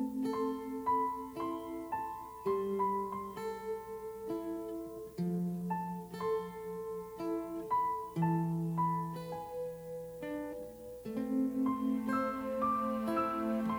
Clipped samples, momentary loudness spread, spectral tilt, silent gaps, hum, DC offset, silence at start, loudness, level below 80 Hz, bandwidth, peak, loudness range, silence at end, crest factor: under 0.1%; 9 LU; -8 dB/octave; none; 60 Hz at -65 dBFS; under 0.1%; 0 s; -37 LUFS; -66 dBFS; over 20 kHz; -22 dBFS; 4 LU; 0 s; 14 dB